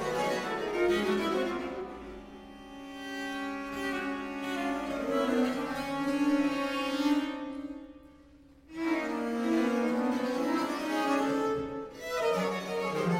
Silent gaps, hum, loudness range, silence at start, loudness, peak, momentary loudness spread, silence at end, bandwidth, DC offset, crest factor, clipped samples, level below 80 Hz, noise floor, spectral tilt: none; none; 5 LU; 0 s; -31 LUFS; -16 dBFS; 14 LU; 0 s; 16.5 kHz; under 0.1%; 16 dB; under 0.1%; -60 dBFS; -56 dBFS; -5 dB/octave